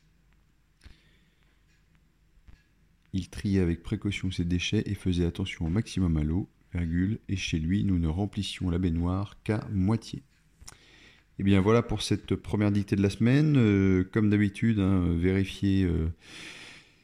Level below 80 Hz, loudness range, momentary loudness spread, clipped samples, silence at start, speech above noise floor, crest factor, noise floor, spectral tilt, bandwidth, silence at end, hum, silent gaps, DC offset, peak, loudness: -48 dBFS; 8 LU; 12 LU; under 0.1%; 0.85 s; 38 dB; 16 dB; -65 dBFS; -7 dB/octave; 11.5 kHz; 0.25 s; none; none; under 0.1%; -12 dBFS; -28 LUFS